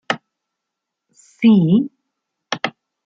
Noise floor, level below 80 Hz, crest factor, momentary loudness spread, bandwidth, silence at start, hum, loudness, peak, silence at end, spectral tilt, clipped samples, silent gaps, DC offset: -81 dBFS; -64 dBFS; 18 dB; 15 LU; 7.6 kHz; 0.1 s; none; -17 LUFS; -2 dBFS; 0.35 s; -6.5 dB/octave; under 0.1%; none; under 0.1%